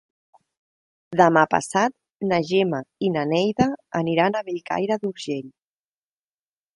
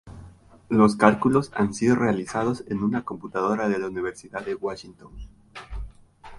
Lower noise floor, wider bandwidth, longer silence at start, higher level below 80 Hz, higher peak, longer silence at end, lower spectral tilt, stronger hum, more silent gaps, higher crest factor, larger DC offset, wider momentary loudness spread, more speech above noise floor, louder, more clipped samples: first, under -90 dBFS vs -48 dBFS; about the same, 11.5 kHz vs 11.5 kHz; first, 1.1 s vs 0.05 s; second, -60 dBFS vs -46 dBFS; about the same, -2 dBFS vs 0 dBFS; first, 1.25 s vs 0 s; about the same, -5.5 dB/octave vs -6.5 dB/octave; neither; first, 2.15-2.20 s vs none; about the same, 22 dB vs 24 dB; neither; second, 10 LU vs 21 LU; first, over 69 dB vs 25 dB; about the same, -22 LUFS vs -24 LUFS; neither